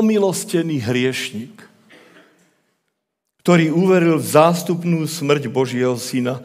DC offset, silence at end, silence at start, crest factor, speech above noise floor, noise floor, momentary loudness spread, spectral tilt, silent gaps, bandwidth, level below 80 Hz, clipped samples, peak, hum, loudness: under 0.1%; 0 s; 0 s; 18 dB; 59 dB; -76 dBFS; 10 LU; -5.5 dB/octave; none; 16 kHz; -74 dBFS; under 0.1%; 0 dBFS; none; -18 LUFS